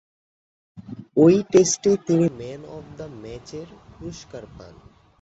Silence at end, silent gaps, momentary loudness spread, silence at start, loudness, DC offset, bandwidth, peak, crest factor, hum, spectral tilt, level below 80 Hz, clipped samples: 0.75 s; none; 23 LU; 0.75 s; -19 LUFS; under 0.1%; 8 kHz; -4 dBFS; 20 dB; none; -5.5 dB/octave; -54 dBFS; under 0.1%